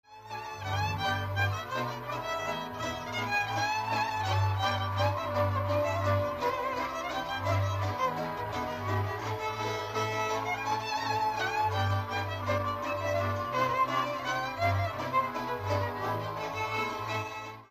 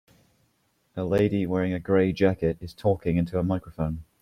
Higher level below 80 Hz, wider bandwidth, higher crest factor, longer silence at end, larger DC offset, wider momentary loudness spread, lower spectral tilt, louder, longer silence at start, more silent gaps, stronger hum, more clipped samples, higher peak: second, -58 dBFS vs -50 dBFS; about the same, 15 kHz vs 14 kHz; about the same, 16 dB vs 18 dB; second, 0.05 s vs 0.2 s; neither; second, 5 LU vs 8 LU; second, -5 dB/octave vs -8.5 dB/octave; second, -31 LUFS vs -26 LUFS; second, 0.1 s vs 0.95 s; neither; neither; neither; second, -16 dBFS vs -8 dBFS